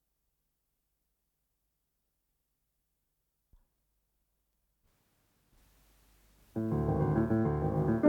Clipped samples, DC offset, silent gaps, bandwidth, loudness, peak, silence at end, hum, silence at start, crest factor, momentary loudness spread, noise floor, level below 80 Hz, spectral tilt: under 0.1%; under 0.1%; none; 4.7 kHz; -32 LUFS; -12 dBFS; 0 s; none; 6.55 s; 24 dB; 8 LU; -82 dBFS; -54 dBFS; -10.5 dB/octave